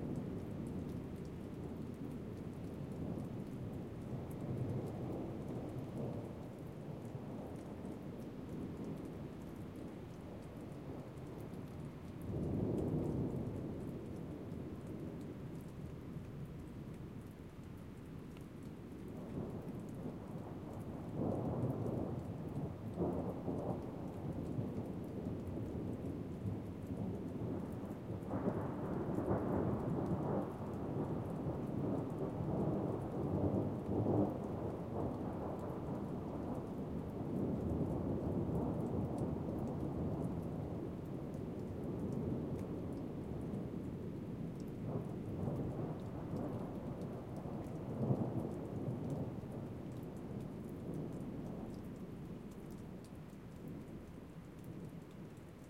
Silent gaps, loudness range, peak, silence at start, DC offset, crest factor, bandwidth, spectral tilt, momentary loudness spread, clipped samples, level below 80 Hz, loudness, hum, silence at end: none; 9 LU; -22 dBFS; 0 s; under 0.1%; 20 dB; 16 kHz; -9 dB/octave; 11 LU; under 0.1%; -58 dBFS; -43 LUFS; none; 0 s